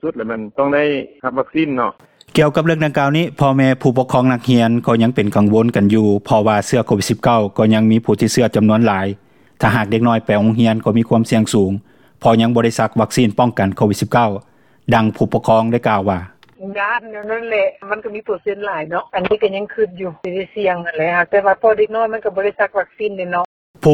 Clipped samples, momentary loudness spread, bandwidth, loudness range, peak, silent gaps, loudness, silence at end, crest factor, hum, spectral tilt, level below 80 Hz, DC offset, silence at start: under 0.1%; 9 LU; 16 kHz; 6 LU; 0 dBFS; 23.45-23.74 s; -16 LUFS; 0 s; 16 dB; none; -6.5 dB/octave; -50 dBFS; under 0.1%; 0.05 s